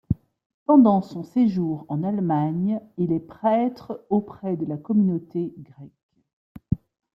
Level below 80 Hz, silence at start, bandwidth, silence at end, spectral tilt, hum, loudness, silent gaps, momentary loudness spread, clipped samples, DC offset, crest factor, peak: -52 dBFS; 0.1 s; 5.8 kHz; 0.4 s; -10.5 dB/octave; none; -23 LUFS; 0.46-0.66 s, 6.03-6.09 s, 6.33-6.55 s; 12 LU; under 0.1%; under 0.1%; 18 dB; -6 dBFS